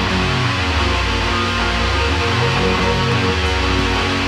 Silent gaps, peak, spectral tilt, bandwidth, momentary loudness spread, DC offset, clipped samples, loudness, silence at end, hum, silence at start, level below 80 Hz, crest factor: none; -4 dBFS; -5 dB/octave; 13 kHz; 1 LU; under 0.1%; under 0.1%; -17 LUFS; 0 s; none; 0 s; -24 dBFS; 12 dB